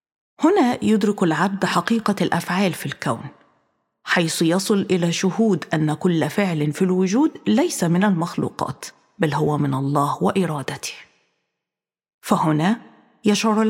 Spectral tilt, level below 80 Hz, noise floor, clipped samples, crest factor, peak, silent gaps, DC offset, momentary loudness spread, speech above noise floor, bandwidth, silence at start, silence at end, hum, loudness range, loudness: -5.5 dB/octave; -64 dBFS; -88 dBFS; under 0.1%; 18 dB; -2 dBFS; 12.14-12.19 s; under 0.1%; 10 LU; 68 dB; 16.5 kHz; 0.4 s; 0 s; none; 4 LU; -20 LUFS